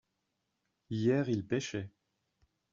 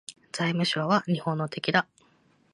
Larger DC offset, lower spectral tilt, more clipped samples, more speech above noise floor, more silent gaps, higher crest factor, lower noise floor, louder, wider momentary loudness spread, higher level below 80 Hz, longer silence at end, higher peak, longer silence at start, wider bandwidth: neither; first, -6.5 dB/octave vs -5 dB/octave; neither; first, 51 dB vs 37 dB; neither; about the same, 18 dB vs 22 dB; first, -83 dBFS vs -64 dBFS; second, -34 LUFS vs -27 LUFS; first, 12 LU vs 7 LU; about the same, -72 dBFS vs -70 dBFS; first, 0.85 s vs 0.7 s; second, -18 dBFS vs -8 dBFS; first, 0.9 s vs 0.1 s; second, 7.4 kHz vs 11.5 kHz